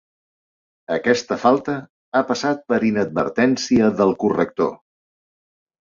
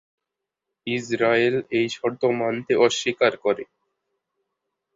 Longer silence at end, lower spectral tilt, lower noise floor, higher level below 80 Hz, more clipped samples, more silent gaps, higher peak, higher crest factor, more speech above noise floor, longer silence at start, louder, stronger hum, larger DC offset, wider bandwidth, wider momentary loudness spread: second, 1.1 s vs 1.3 s; about the same, -5.5 dB/octave vs -4.5 dB/octave; first, under -90 dBFS vs -85 dBFS; first, -58 dBFS vs -66 dBFS; neither; first, 1.89-2.12 s vs none; about the same, -2 dBFS vs -4 dBFS; about the same, 18 dB vs 20 dB; first, over 71 dB vs 63 dB; about the same, 0.9 s vs 0.85 s; about the same, -20 LUFS vs -22 LUFS; neither; neither; about the same, 7.6 kHz vs 7.8 kHz; about the same, 7 LU vs 9 LU